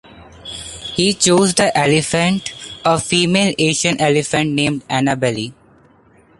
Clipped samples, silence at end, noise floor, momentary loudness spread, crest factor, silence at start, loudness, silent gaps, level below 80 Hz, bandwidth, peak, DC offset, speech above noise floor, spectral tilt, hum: under 0.1%; 0.85 s; -50 dBFS; 15 LU; 18 dB; 0.15 s; -15 LUFS; none; -48 dBFS; 11.5 kHz; 0 dBFS; under 0.1%; 35 dB; -4 dB/octave; none